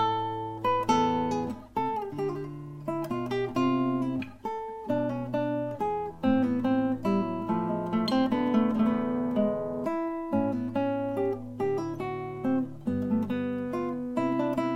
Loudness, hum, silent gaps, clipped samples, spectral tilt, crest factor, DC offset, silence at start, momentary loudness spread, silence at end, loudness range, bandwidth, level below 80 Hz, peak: -29 LUFS; none; none; under 0.1%; -7 dB/octave; 16 dB; under 0.1%; 0 s; 8 LU; 0 s; 4 LU; 12.5 kHz; -58 dBFS; -12 dBFS